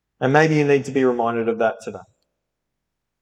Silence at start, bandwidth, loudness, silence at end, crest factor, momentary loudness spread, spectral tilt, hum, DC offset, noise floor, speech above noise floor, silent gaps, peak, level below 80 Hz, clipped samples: 0.2 s; 10.5 kHz; -19 LUFS; 1.2 s; 18 dB; 9 LU; -6.5 dB/octave; none; under 0.1%; -79 dBFS; 61 dB; none; -2 dBFS; -68 dBFS; under 0.1%